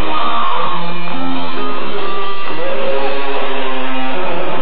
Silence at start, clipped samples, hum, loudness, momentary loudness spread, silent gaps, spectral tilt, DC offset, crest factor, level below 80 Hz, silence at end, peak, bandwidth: 0 s; under 0.1%; none; -20 LUFS; 5 LU; none; -7.5 dB/octave; 50%; 12 dB; -56 dBFS; 0 s; -2 dBFS; 5.2 kHz